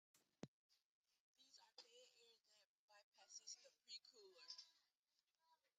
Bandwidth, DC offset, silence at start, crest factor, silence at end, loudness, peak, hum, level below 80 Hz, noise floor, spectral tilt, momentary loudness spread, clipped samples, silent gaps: 9 kHz; under 0.1%; 0.15 s; 28 dB; 0.1 s; -62 LUFS; -40 dBFS; none; under -90 dBFS; under -90 dBFS; -1.5 dB/octave; 9 LU; under 0.1%; 0.48-0.70 s, 0.84-1.04 s, 1.20-1.34 s, 2.65-2.88 s, 3.04-3.12 s, 4.99-5.03 s